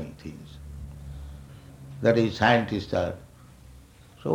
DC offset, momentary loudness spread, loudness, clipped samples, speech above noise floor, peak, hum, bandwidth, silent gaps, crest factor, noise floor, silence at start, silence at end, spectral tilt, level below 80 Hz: under 0.1%; 23 LU; -24 LUFS; under 0.1%; 27 dB; -6 dBFS; none; 15.5 kHz; none; 22 dB; -51 dBFS; 0 s; 0 s; -6.5 dB/octave; -48 dBFS